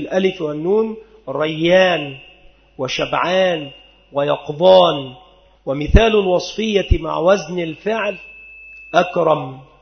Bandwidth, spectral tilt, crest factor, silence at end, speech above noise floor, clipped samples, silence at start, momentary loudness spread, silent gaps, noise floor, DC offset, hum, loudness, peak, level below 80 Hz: 6.6 kHz; -5.5 dB/octave; 18 dB; 0.2 s; 31 dB; under 0.1%; 0 s; 20 LU; none; -47 dBFS; under 0.1%; none; -17 LUFS; 0 dBFS; -28 dBFS